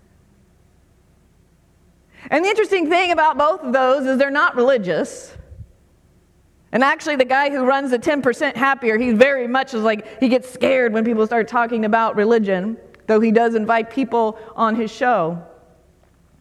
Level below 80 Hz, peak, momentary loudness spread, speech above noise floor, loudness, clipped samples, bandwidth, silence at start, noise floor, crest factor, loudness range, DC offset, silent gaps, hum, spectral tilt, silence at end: -56 dBFS; 0 dBFS; 6 LU; 38 dB; -18 LUFS; under 0.1%; 12.5 kHz; 2.2 s; -55 dBFS; 18 dB; 3 LU; under 0.1%; none; none; -5.5 dB/octave; 0.95 s